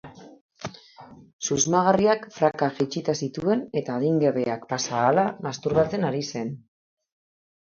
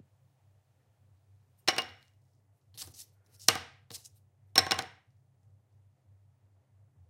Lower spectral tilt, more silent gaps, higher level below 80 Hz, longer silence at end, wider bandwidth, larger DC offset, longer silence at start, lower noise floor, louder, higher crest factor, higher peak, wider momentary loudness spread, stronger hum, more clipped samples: first, -5 dB/octave vs 0 dB/octave; first, 0.41-0.49 s, 1.33-1.39 s vs none; first, -58 dBFS vs -74 dBFS; second, 1.1 s vs 2.2 s; second, 7.6 kHz vs 16.5 kHz; neither; second, 0.05 s vs 1.65 s; second, -48 dBFS vs -68 dBFS; first, -24 LUFS vs -29 LUFS; second, 20 dB vs 36 dB; second, -6 dBFS vs -2 dBFS; second, 13 LU vs 24 LU; neither; neither